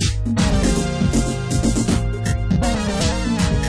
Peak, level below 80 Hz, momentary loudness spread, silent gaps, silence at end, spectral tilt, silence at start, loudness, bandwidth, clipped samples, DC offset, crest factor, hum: -6 dBFS; -24 dBFS; 3 LU; none; 0 s; -5.5 dB/octave; 0 s; -20 LUFS; 11 kHz; under 0.1%; under 0.1%; 12 dB; none